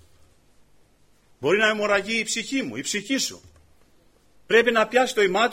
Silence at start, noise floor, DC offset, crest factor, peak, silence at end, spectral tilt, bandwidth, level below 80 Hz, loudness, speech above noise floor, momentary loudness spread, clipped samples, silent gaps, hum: 1.4 s; -58 dBFS; under 0.1%; 18 dB; -6 dBFS; 0 s; -2.5 dB/octave; 16 kHz; -62 dBFS; -22 LUFS; 36 dB; 8 LU; under 0.1%; none; 50 Hz at -65 dBFS